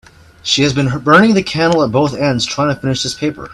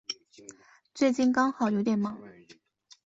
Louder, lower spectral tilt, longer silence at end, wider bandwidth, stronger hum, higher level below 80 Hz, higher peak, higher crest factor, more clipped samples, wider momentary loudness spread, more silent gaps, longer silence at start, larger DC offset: first, -13 LUFS vs -27 LUFS; about the same, -5 dB/octave vs -5.5 dB/octave; second, 0 s vs 0.75 s; first, 12.5 kHz vs 8 kHz; neither; first, -44 dBFS vs -72 dBFS; first, 0 dBFS vs -10 dBFS; about the same, 14 dB vs 18 dB; neither; second, 8 LU vs 21 LU; neither; first, 0.45 s vs 0.1 s; neither